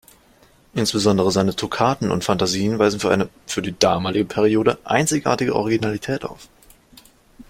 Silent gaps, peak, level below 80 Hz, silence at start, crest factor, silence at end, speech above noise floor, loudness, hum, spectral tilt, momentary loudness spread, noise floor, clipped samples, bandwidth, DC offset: none; 0 dBFS; -50 dBFS; 0.75 s; 20 dB; 0.05 s; 34 dB; -20 LUFS; none; -4.5 dB/octave; 8 LU; -53 dBFS; under 0.1%; 16.5 kHz; under 0.1%